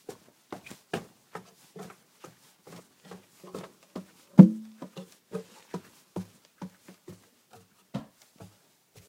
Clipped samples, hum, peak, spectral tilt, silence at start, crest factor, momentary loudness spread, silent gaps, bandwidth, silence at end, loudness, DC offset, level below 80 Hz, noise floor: under 0.1%; none; 0 dBFS; -8.5 dB/octave; 0.95 s; 30 dB; 29 LU; none; 11.5 kHz; 1.1 s; -22 LUFS; under 0.1%; -76 dBFS; -62 dBFS